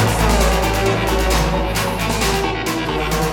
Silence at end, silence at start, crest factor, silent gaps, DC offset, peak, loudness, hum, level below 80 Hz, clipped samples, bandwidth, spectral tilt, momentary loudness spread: 0 s; 0 s; 14 dB; none; under 0.1%; -2 dBFS; -18 LUFS; none; -22 dBFS; under 0.1%; 19 kHz; -4.5 dB/octave; 4 LU